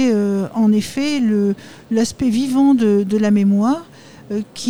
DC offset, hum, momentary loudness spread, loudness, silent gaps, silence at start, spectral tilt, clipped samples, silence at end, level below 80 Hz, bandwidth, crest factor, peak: 0.4%; none; 10 LU; -17 LUFS; none; 0 s; -6 dB/octave; under 0.1%; 0 s; -52 dBFS; 19.5 kHz; 10 dB; -6 dBFS